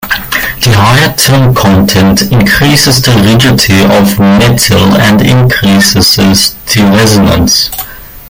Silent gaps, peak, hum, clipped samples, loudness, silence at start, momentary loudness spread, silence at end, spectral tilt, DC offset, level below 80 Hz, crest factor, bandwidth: none; 0 dBFS; none; 0.7%; -5 LUFS; 0 s; 3 LU; 0 s; -4.5 dB/octave; under 0.1%; -26 dBFS; 6 dB; 19 kHz